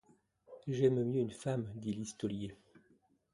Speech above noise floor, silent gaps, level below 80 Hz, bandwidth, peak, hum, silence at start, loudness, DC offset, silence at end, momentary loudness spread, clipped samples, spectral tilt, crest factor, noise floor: 36 dB; none; -68 dBFS; 11.5 kHz; -18 dBFS; none; 0.5 s; -36 LUFS; under 0.1%; 0.55 s; 12 LU; under 0.1%; -7 dB/octave; 20 dB; -72 dBFS